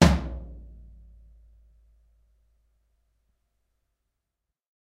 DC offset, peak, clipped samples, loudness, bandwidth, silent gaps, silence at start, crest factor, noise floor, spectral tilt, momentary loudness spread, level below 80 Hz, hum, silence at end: under 0.1%; -2 dBFS; under 0.1%; -27 LUFS; 13.5 kHz; none; 0 s; 30 dB; -85 dBFS; -6 dB/octave; 28 LU; -38 dBFS; none; 4.3 s